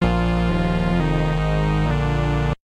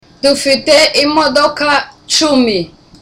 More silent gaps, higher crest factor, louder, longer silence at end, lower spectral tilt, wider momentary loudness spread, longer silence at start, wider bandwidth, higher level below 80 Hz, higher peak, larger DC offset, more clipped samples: neither; about the same, 14 dB vs 12 dB; second, -21 LUFS vs -11 LUFS; second, 0.1 s vs 0.35 s; first, -7.5 dB/octave vs -2 dB/octave; second, 1 LU vs 7 LU; second, 0 s vs 0.25 s; second, 9.6 kHz vs 15.5 kHz; first, -26 dBFS vs -44 dBFS; second, -6 dBFS vs 0 dBFS; neither; neither